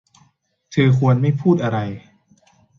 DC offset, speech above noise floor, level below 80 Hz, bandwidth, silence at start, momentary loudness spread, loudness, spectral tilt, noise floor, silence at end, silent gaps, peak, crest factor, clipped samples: under 0.1%; 44 dB; -54 dBFS; 7 kHz; 0.7 s; 12 LU; -18 LUFS; -8.5 dB/octave; -61 dBFS; 0.8 s; none; -4 dBFS; 16 dB; under 0.1%